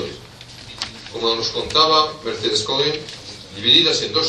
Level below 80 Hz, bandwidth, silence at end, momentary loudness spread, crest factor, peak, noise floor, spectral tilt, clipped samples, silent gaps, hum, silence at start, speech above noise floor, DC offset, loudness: -50 dBFS; 12 kHz; 0 s; 22 LU; 20 dB; 0 dBFS; -39 dBFS; -2.5 dB/octave; under 0.1%; none; none; 0 s; 21 dB; under 0.1%; -17 LUFS